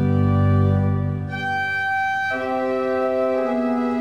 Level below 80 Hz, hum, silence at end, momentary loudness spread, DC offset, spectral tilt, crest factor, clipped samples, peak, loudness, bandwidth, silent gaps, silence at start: -48 dBFS; none; 0 s; 6 LU; 0.2%; -8.5 dB/octave; 12 dB; under 0.1%; -8 dBFS; -21 LUFS; 6.6 kHz; none; 0 s